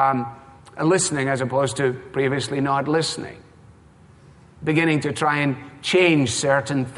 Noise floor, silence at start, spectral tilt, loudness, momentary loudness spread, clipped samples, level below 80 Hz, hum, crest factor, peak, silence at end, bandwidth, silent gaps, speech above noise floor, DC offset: -50 dBFS; 0 s; -4.5 dB/octave; -21 LUFS; 10 LU; under 0.1%; -56 dBFS; none; 18 dB; -4 dBFS; 0 s; 11.5 kHz; none; 29 dB; under 0.1%